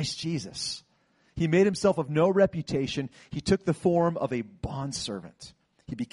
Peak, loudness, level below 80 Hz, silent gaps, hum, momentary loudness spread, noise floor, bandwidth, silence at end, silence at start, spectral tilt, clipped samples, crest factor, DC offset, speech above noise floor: -10 dBFS; -27 LUFS; -52 dBFS; none; none; 14 LU; -66 dBFS; 11.5 kHz; 0.1 s; 0 s; -5.5 dB/octave; under 0.1%; 18 dB; under 0.1%; 39 dB